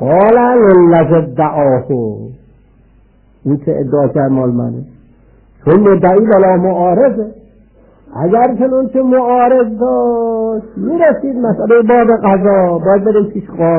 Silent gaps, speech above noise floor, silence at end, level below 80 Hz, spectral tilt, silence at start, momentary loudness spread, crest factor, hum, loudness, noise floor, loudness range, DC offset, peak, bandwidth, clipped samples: none; 37 dB; 0 s; -44 dBFS; -12.5 dB/octave; 0 s; 11 LU; 10 dB; none; -11 LUFS; -46 dBFS; 5 LU; under 0.1%; 0 dBFS; 3.5 kHz; under 0.1%